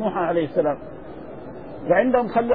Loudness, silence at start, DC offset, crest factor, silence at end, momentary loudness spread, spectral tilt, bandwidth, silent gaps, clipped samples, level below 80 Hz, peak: -21 LUFS; 0 s; 0.6%; 16 dB; 0 s; 19 LU; -10.5 dB/octave; 4.8 kHz; none; under 0.1%; -52 dBFS; -6 dBFS